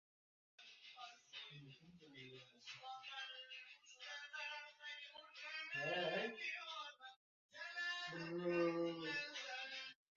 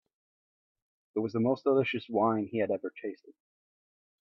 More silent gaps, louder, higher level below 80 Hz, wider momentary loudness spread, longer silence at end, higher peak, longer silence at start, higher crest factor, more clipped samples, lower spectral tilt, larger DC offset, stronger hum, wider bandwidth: first, 7.16-7.49 s vs none; second, -47 LUFS vs -30 LUFS; second, under -90 dBFS vs -76 dBFS; first, 18 LU vs 13 LU; second, 0.25 s vs 0.9 s; second, -28 dBFS vs -14 dBFS; second, 0.6 s vs 1.15 s; about the same, 20 dB vs 18 dB; neither; second, -2 dB/octave vs -8.5 dB/octave; neither; neither; first, 7.4 kHz vs 6 kHz